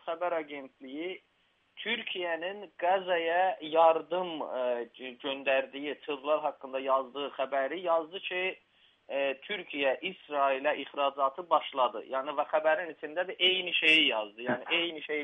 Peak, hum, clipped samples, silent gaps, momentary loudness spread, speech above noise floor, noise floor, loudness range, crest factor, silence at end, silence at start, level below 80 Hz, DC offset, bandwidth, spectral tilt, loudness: -12 dBFS; none; under 0.1%; none; 13 LU; 21 dB; -52 dBFS; 5 LU; 20 dB; 0 s; 0.05 s; -86 dBFS; under 0.1%; 9 kHz; -4 dB/octave; -30 LUFS